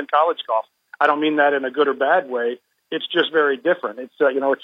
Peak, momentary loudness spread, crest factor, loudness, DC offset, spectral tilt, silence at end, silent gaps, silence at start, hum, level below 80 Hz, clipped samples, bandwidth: -2 dBFS; 10 LU; 18 dB; -20 LUFS; under 0.1%; -5.5 dB/octave; 0.1 s; none; 0 s; none; -90 dBFS; under 0.1%; 5.4 kHz